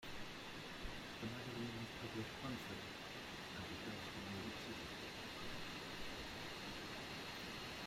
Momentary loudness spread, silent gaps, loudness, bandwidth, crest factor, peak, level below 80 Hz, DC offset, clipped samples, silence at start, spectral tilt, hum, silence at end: 3 LU; none; -49 LUFS; 16 kHz; 14 dB; -34 dBFS; -64 dBFS; under 0.1%; under 0.1%; 0 s; -4 dB/octave; none; 0 s